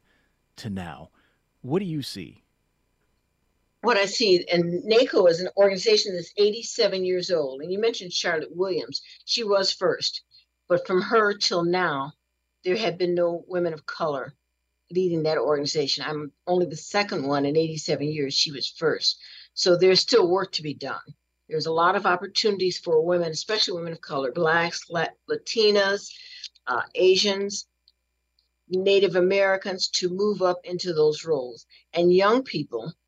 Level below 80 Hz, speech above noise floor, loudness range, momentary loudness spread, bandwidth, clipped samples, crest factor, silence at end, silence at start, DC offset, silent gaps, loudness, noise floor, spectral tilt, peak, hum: -72 dBFS; 51 dB; 5 LU; 13 LU; 10 kHz; under 0.1%; 18 dB; 0.15 s; 0.6 s; under 0.1%; none; -24 LUFS; -75 dBFS; -4 dB/octave; -6 dBFS; none